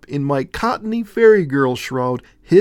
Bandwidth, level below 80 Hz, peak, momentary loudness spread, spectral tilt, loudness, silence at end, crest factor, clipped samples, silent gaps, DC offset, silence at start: 13 kHz; -48 dBFS; 0 dBFS; 10 LU; -7 dB/octave; -17 LUFS; 0 s; 16 dB; under 0.1%; none; under 0.1%; 0.1 s